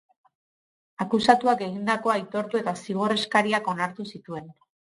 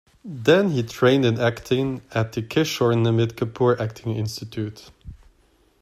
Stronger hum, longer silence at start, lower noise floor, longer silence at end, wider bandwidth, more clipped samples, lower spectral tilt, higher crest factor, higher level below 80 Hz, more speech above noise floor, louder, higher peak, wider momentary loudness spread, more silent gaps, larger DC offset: neither; first, 1 s vs 0.25 s; first, under -90 dBFS vs -60 dBFS; second, 0.35 s vs 0.7 s; second, 11.5 kHz vs 14.5 kHz; neither; second, -5 dB/octave vs -6.5 dB/octave; first, 24 dB vs 18 dB; second, -68 dBFS vs -54 dBFS; first, over 65 dB vs 38 dB; about the same, -24 LUFS vs -22 LUFS; about the same, -2 dBFS vs -4 dBFS; first, 16 LU vs 11 LU; neither; neither